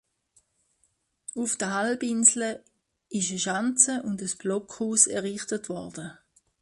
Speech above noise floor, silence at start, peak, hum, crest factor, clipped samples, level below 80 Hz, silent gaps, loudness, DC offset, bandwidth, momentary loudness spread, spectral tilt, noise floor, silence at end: 45 dB; 1.35 s; -4 dBFS; none; 26 dB; under 0.1%; -70 dBFS; none; -25 LUFS; under 0.1%; 11.5 kHz; 19 LU; -2.5 dB/octave; -72 dBFS; 0.5 s